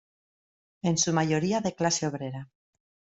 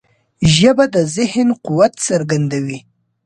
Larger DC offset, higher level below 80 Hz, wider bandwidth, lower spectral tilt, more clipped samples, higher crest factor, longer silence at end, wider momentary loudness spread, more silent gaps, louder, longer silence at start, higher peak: neither; second, -66 dBFS vs -42 dBFS; second, 8.2 kHz vs 11.5 kHz; about the same, -4 dB/octave vs -5 dB/octave; neither; about the same, 20 dB vs 16 dB; first, 0.7 s vs 0.45 s; about the same, 12 LU vs 10 LU; neither; second, -27 LUFS vs -15 LUFS; first, 0.85 s vs 0.4 s; second, -10 dBFS vs 0 dBFS